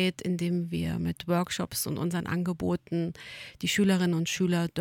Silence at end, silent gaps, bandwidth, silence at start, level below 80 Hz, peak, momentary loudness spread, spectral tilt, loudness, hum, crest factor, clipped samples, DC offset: 0 s; none; 17 kHz; 0 s; -56 dBFS; -14 dBFS; 7 LU; -5 dB/octave; -29 LUFS; none; 14 dB; under 0.1%; under 0.1%